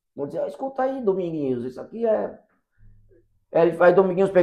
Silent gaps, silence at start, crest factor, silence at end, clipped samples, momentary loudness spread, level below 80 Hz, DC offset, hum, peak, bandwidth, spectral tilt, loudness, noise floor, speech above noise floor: none; 0.15 s; 20 dB; 0 s; under 0.1%; 13 LU; -60 dBFS; under 0.1%; none; -2 dBFS; 9.8 kHz; -8.5 dB/octave; -22 LUFS; -58 dBFS; 37 dB